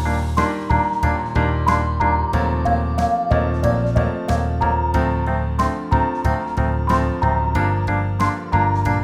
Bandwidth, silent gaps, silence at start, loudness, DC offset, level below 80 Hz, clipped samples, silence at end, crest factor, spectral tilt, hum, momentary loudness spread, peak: 12 kHz; none; 0 s; -20 LUFS; 0.1%; -26 dBFS; under 0.1%; 0 s; 16 dB; -7.5 dB/octave; none; 3 LU; -4 dBFS